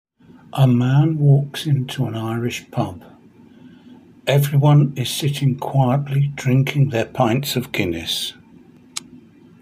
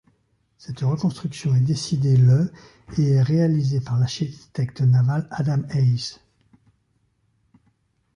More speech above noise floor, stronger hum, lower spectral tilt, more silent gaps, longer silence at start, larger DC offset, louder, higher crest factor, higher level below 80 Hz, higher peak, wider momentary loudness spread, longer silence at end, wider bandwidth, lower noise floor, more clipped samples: second, 29 dB vs 47 dB; neither; about the same, -6.5 dB/octave vs -7.5 dB/octave; neither; second, 0.55 s vs 0.7 s; neither; about the same, -19 LUFS vs -21 LUFS; about the same, 16 dB vs 14 dB; about the same, -54 dBFS vs -54 dBFS; first, -2 dBFS vs -8 dBFS; about the same, 12 LU vs 11 LU; second, 0.45 s vs 2 s; first, 16 kHz vs 10.5 kHz; second, -47 dBFS vs -67 dBFS; neither